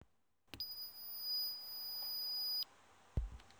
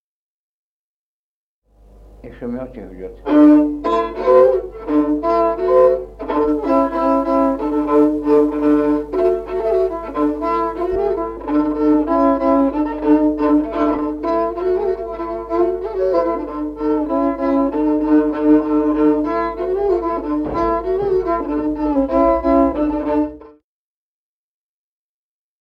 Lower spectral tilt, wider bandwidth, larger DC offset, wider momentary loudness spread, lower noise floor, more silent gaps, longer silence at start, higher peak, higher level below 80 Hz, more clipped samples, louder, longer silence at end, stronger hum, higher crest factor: second, -3 dB/octave vs -8.5 dB/octave; first, over 20 kHz vs 5.4 kHz; neither; about the same, 9 LU vs 8 LU; second, -77 dBFS vs under -90 dBFS; neither; second, 0 s vs 2.1 s; second, -26 dBFS vs -2 dBFS; second, -54 dBFS vs -40 dBFS; neither; second, -41 LUFS vs -17 LUFS; second, 0 s vs 2.1 s; second, none vs 50 Hz at -45 dBFS; about the same, 18 dB vs 16 dB